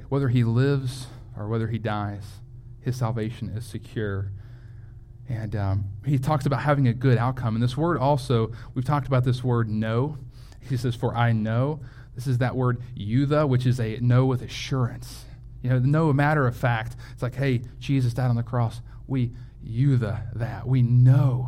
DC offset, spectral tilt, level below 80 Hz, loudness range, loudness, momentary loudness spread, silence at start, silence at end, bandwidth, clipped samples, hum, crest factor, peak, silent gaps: under 0.1%; -8 dB/octave; -44 dBFS; 7 LU; -25 LUFS; 17 LU; 0 s; 0 s; 11.5 kHz; under 0.1%; none; 16 dB; -8 dBFS; none